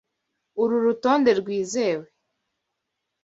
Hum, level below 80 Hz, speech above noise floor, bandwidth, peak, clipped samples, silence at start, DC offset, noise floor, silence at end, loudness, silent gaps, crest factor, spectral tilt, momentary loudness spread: none; -68 dBFS; 59 dB; 8 kHz; -6 dBFS; under 0.1%; 0.55 s; under 0.1%; -81 dBFS; 1.2 s; -23 LUFS; none; 18 dB; -4.5 dB/octave; 9 LU